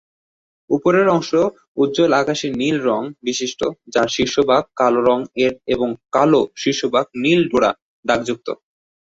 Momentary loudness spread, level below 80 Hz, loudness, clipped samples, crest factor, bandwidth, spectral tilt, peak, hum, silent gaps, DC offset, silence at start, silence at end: 8 LU; -54 dBFS; -18 LUFS; under 0.1%; 16 dB; 8 kHz; -4.5 dB/octave; -2 dBFS; none; 1.68-1.75 s, 7.82-8.03 s; under 0.1%; 0.7 s; 0.55 s